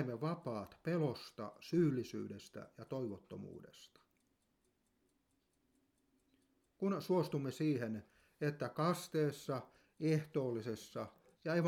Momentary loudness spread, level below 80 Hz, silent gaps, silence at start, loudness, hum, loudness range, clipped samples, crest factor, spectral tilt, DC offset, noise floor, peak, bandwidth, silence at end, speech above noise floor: 15 LU; -78 dBFS; none; 0 s; -40 LUFS; none; 13 LU; under 0.1%; 18 dB; -7 dB/octave; under 0.1%; -80 dBFS; -22 dBFS; 16.5 kHz; 0 s; 41 dB